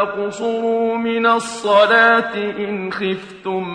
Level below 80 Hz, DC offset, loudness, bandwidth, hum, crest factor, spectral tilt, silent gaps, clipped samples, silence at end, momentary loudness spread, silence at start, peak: -60 dBFS; under 0.1%; -17 LUFS; 10.5 kHz; none; 16 dB; -4 dB/octave; none; under 0.1%; 0 s; 12 LU; 0 s; 0 dBFS